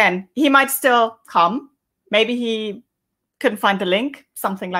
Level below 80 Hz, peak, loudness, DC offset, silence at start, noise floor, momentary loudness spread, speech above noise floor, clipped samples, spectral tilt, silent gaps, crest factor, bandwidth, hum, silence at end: -72 dBFS; -2 dBFS; -18 LUFS; under 0.1%; 0 s; -78 dBFS; 12 LU; 60 dB; under 0.1%; -3.5 dB/octave; none; 18 dB; 16 kHz; none; 0 s